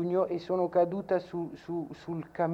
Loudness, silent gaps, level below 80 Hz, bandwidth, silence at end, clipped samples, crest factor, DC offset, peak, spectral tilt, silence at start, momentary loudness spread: -32 LUFS; none; -66 dBFS; 7.6 kHz; 0 s; under 0.1%; 16 dB; under 0.1%; -16 dBFS; -8.5 dB/octave; 0 s; 11 LU